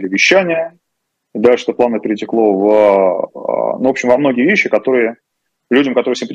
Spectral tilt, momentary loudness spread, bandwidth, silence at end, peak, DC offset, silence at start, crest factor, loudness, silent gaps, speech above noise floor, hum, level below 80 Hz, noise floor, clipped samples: -4.5 dB/octave; 9 LU; 8.6 kHz; 0 s; 0 dBFS; under 0.1%; 0 s; 14 dB; -13 LUFS; none; 60 dB; none; -60 dBFS; -73 dBFS; under 0.1%